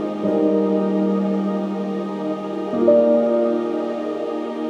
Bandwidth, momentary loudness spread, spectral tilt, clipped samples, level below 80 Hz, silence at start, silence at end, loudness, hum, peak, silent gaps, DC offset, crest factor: 8 kHz; 10 LU; -9 dB/octave; under 0.1%; -68 dBFS; 0 s; 0 s; -20 LUFS; none; -2 dBFS; none; under 0.1%; 16 dB